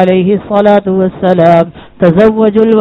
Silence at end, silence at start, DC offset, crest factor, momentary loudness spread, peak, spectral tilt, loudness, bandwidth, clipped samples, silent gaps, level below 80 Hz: 0 s; 0 s; under 0.1%; 8 dB; 5 LU; 0 dBFS; -9.5 dB/octave; -9 LUFS; 5.8 kHz; 2%; none; -40 dBFS